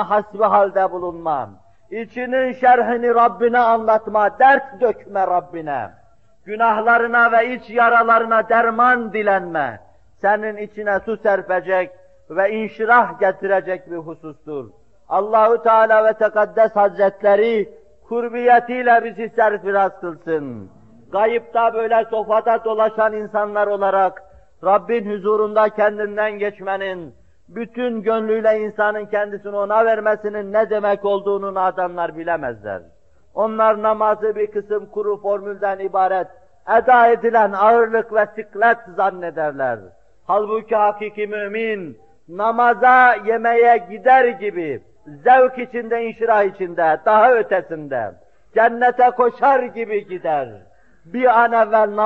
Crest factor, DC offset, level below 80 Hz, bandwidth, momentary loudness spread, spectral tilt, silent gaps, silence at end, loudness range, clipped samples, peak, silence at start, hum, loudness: 16 dB; 0.3%; -60 dBFS; 6 kHz; 13 LU; -7 dB/octave; none; 0 s; 5 LU; under 0.1%; -2 dBFS; 0 s; none; -17 LUFS